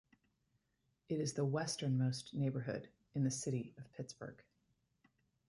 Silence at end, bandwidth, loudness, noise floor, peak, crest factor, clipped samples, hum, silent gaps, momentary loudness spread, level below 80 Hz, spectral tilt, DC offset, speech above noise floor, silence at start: 1.05 s; 11.5 kHz; -40 LUFS; -83 dBFS; -26 dBFS; 16 dB; under 0.1%; none; none; 13 LU; -76 dBFS; -5.5 dB/octave; under 0.1%; 43 dB; 1.1 s